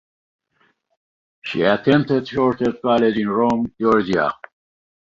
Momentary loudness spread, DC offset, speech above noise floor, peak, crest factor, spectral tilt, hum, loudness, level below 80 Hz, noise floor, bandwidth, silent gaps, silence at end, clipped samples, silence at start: 7 LU; under 0.1%; 45 dB; -2 dBFS; 18 dB; -7.5 dB/octave; none; -19 LUFS; -54 dBFS; -63 dBFS; 7.4 kHz; none; 0.8 s; under 0.1%; 1.45 s